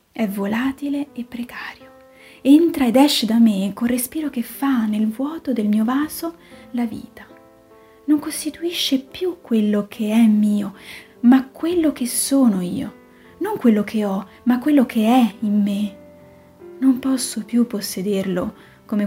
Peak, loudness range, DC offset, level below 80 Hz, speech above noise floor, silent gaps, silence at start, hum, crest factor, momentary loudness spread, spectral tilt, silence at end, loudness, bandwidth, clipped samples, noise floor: -2 dBFS; 6 LU; under 0.1%; -56 dBFS; 30 dB; none; 0.15 s; none; 18 dB; 14 LU; -5 dB/octave; 0 s; -19 LUFS; 16 kHz; under 0.1%; -48 dBFS